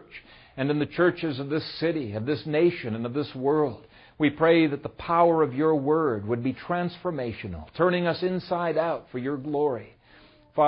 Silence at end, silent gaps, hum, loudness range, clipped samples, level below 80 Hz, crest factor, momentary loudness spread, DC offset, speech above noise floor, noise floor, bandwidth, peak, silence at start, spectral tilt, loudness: 0 s; none; none; 4 LU; under 0.1%; -58 dBFS; 18 dB; 11 LU; under 0.1%; 30 dB; -55 dBFS; 5.6 kHz; -8 dBFS; 0 s; -11 dB/octave; -26 LUFS